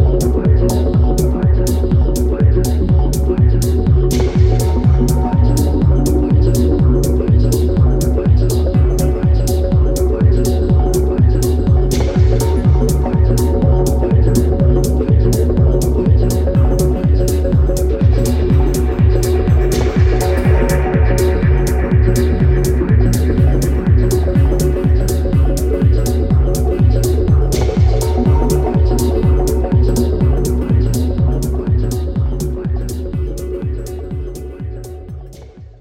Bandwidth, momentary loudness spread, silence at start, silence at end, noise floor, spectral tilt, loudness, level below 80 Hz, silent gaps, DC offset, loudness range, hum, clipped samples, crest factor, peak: 16 kHz; 4 LU; 0 s; 0.15 s; -35 dBFS; -7.5 dB/octave; -14 LUFS; -16 dBFS; none; under 0.1%; 2 LU; none; under 0.1%; 12 dB; -2 dBFS